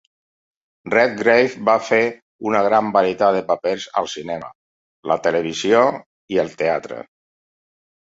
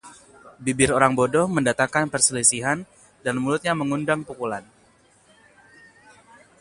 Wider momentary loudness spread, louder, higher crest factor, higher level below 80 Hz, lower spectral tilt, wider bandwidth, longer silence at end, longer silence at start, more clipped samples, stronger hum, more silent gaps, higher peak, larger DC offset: about the same, 13 LU vs 12 LU; about the same, -19 LUFS vs -21 LUFS; second, 18 dB vs 24 dB; second, -62 dBFS vs -54 dBFS; about the same, -4.5 dB/octave vs -3.5 dB/octave; second, 7.8 kHz vs 11.5 kHz; second, 1.1 s vs 2 s; first, 0.85 s vs 0.05 s; neither; neither; first, 2.22-2.39 s, 4.55-5.03 s, 6.06-6.28 s vs none; about the same, -2 dBFS vs 0 dBFS; neither